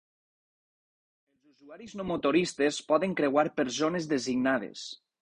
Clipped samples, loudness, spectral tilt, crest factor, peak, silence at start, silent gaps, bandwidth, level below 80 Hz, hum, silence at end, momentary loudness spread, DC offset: under 0.1%; -28 LUFS; -4.5 dB/octave; 20 dB; -12 dBFS; 1.65 s; none; 10.5 kHz; -66 dBFS; none; 0.25 s; 14 LU; under 0.1%